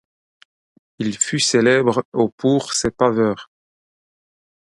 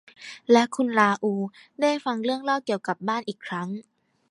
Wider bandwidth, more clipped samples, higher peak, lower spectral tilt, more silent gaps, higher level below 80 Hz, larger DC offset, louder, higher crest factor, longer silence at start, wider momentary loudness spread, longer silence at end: about the same, 11.5 kHz vs 11.5 kHz; neither; about the same, -2 dBFS vs -4 dBFS; about the same, -4 dB/octave vs -5 dB/octave; first, 2.05-2.12 s, 2.32-2.38 s vs none; first, -52 dBFS vs -76 dBFS; neither; first, -18 LUFS vs -25 LUFS; about the same, 18 dB vs 20 dB; first, 1 s vs 0.2 s; second, 9 LU vs 14 LU; first, 1.25 s vs 0.5 s